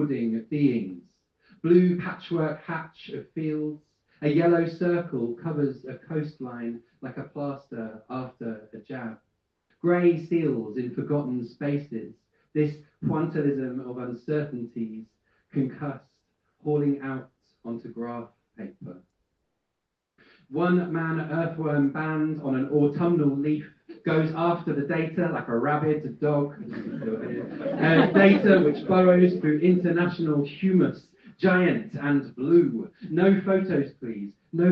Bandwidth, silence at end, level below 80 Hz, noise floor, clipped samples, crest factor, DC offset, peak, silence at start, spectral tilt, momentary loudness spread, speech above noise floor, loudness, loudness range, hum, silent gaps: 5.6 kHz; 0 s; -68 dBFS; -82 dBFS; under 0.1%; 22 dB; under 0.1%; -4 dBFS; 0 s; -10 dB/octave; 17 LU; 58 dB; -25 LUFS; 12 LU; none; none